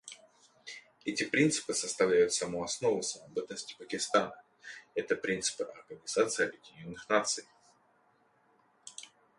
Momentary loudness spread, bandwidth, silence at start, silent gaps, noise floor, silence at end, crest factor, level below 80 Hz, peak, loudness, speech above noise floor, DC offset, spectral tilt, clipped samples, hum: 21 LU; 11.5 kHz; 0.05 s; none; -69 dBFS; 0.35 s; 24 dB; -72 dBFS; -12 dBFS; -32 LUFS; 37 dB; under 0.1%; -3 dB/octave; under 0.1%; none